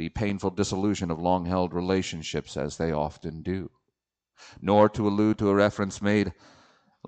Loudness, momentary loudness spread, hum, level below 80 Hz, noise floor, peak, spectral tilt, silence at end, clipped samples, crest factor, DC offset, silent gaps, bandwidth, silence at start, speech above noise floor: -26 LUFS; 11 LU; none; -50 dBFS; -83 dBFS; -6 dBFS; -6 dB/octave; 0.75 s; under 0.1%; 20 dB; under 0.1%; none; 9 kHz; 0 s; 57 dB